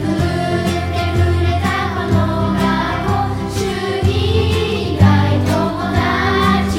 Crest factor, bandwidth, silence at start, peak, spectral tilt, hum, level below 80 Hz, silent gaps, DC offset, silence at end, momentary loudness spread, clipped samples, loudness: 14 dB; 15.5 kHz; 0 s; 0 dBFS; -6.5 dB/octave; none; -30 dBFS; none; under 0.1%; 0 s; 5 LU; under 0.1%; -16 LUFS